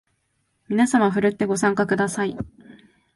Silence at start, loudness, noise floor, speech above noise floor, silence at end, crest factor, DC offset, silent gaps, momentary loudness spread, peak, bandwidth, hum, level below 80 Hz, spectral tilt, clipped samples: 0.7 s; -21 LUFS; -71 dBFS; 50 dB; 0.45 s; 18 dB; under 0.1%; none; 9 LU; -6 dBFS; 11.5 kHz; none; -56 dBFS; -5.5 dB/octave; under 0.1%